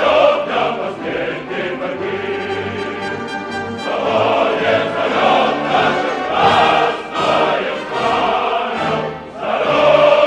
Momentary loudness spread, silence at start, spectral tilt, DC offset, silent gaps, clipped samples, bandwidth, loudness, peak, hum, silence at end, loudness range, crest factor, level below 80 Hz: 10 LU; 0 s; -5 dB/octave; under 0.1%; none; under 0.1%; 10 kHz; -16 LUFS; 0 dBFS; none; 0 s; 6 LU; 16 dB; -52 dBFS